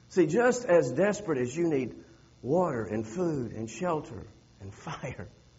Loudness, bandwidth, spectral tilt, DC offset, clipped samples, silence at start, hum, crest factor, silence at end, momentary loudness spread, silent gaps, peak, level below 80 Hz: -29 LUFS; 8 kHz; -6.5 dB/octave; under 0.1%; under 0.1%; 0.1 s; none; 18 dB; 0.3 s; 20 LU; none; -12 dBFS; -62 dBFS